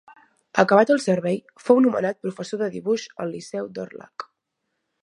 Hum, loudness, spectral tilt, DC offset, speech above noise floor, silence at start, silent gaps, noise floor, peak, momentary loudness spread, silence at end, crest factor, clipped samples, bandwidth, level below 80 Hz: none; -22 LUFS; -6 dB/octave; under 0.1%; 56 dB; 0.55 s; none; -78 dBFS; 0 dBFS; 19 LU; 0.8 s; 22 dB; under 0.1%; 11 kHz; -72 dBFS